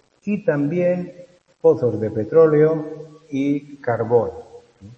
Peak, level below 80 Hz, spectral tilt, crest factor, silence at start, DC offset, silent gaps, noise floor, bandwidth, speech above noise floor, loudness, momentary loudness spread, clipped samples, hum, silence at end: -2 dBFS; -60 dBFS; -9.5 dB/octave; 18 dB; 0.25 s; under 0.1%; none; -43 dBFS; 6.6 kHz; 25 dB; -20 LUFS; 15 LU; under 0.1%; none; 0.05 s